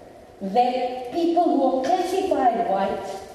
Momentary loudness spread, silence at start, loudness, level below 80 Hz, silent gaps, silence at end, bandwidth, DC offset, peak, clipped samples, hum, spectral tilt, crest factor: 7 LU; 0 s; -22 LUFS; -58 dBFS; none; 0 s; 13.5 kHz; under 0.1%; -8 dBFS; under 0.1%; none; -5.5 dB/octave; 16 dB